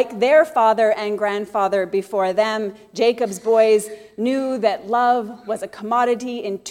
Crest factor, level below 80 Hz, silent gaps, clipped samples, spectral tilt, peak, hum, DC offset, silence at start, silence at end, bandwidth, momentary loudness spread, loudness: 16 dB; -66 dBFS; none; under 0.1%; -4 dB/octave; -4 dBFS; none; under 0.1%; 0 s; 0 s; 16 kHz; 12 LU; -19 LUFS